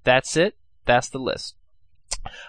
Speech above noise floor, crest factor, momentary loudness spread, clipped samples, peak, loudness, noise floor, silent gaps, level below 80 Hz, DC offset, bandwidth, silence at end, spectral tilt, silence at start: 41 dB; 20 dB; 14 LU; under 0.1%; -4 dBFS; -23 LUFS; -62 dBFS; none; -44 dBFS; 0.3%; 9.8 kHz; 0 s; -3.5 dB/octave; 0.05 s